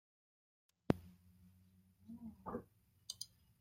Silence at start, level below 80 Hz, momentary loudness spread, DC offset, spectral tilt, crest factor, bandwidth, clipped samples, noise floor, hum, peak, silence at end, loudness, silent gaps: 0.9 s; -70 dBFS; 23 LU; under 0.1%; -5.5 dB/octave; 34 dB; 16 kHz; under 0.1%; -70 dBFS; none; -14 dBFS; 0.35 s; -46 LUFS; none